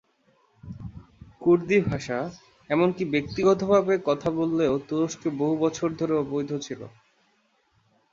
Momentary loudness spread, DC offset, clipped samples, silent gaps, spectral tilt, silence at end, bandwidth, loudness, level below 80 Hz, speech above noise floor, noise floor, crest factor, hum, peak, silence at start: 18 LU; under 0.1%; under 0.1%; none; -6.5 dB/octave; 1.25 s; 7.6 kHz; -25 LUFS; -56 dBFS; 43 dB; -67 dBFS; 18 dB; none; -8 dBFS; 0.65 s